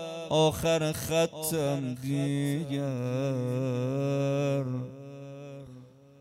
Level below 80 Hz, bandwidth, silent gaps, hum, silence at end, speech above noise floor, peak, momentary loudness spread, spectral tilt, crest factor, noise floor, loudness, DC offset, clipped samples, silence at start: -60 dBFS; 16 kHz; none; none; 0.3 s; 22 dB; -12 dBFS; 18 LU; -5.5 dB/octave; 18 dB; -51 dBFS; -29 LUFS; under 0.1%; under 0.1%; 0 s